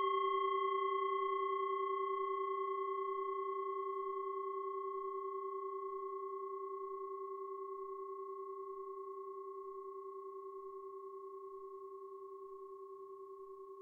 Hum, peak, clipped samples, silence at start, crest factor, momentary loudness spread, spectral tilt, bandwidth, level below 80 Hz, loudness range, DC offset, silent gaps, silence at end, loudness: none; -26 dBFS; under 0.1%; 0 s; 16 dB; 15 LU; -4.5 dB/octave; 3.4 kHz; -88 dBFS; 12 LU; under 0.1%; none; 0 s; -42 LUFS